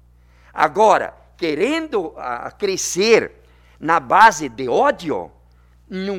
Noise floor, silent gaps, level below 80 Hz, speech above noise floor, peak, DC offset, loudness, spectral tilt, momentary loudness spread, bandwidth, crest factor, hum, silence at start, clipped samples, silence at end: -51 dBFS; none; -52 dBFS; 33 dB; 0 dBFS; under 0.1%; -18 LUFS; -3 dB/octave; 17 LU; 16.5 kHz; 18 dB; 60 Hz at -50 dBFS; 0.55 s; under 0.1%; 0 s